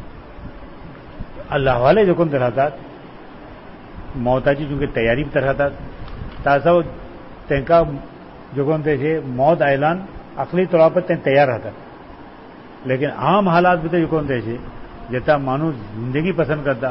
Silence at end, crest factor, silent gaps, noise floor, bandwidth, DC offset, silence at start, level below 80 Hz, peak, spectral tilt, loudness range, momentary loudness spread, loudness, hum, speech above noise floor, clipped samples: 0 s; 16 dB; none; -39 dBFS; 5.8 kHz; 0.1%; 0 s; -38 dBFS; -2 dBFS; -12 dB/octave; 3 LU; 24 LU; -18 LUFS; none; 22 dB; under 0.1%